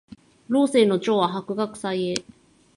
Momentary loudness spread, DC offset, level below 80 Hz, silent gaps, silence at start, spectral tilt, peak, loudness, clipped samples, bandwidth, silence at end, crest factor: 9 LU; under 0.1%; -66 dBFS; none; 0.5 s; -5.5 dB/octave; -2 dBFS; -23 LUFS; under 0.1%; 11.5 kHz; 0.55 s; 22 dB